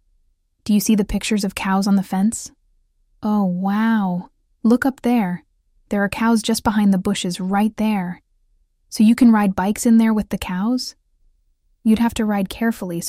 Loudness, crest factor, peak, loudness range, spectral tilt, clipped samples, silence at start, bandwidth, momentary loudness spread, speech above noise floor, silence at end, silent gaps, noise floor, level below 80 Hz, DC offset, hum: -19 LUFS; 14 dB; -4 dBFS; 3 LU; -5.5 dB/octave; under 0.1%; 0.65 s; 15.5 kHz; 10 LU; 45 dB; 0 s; none; -63 dBFS; -44 dBFS; under 0.1%; none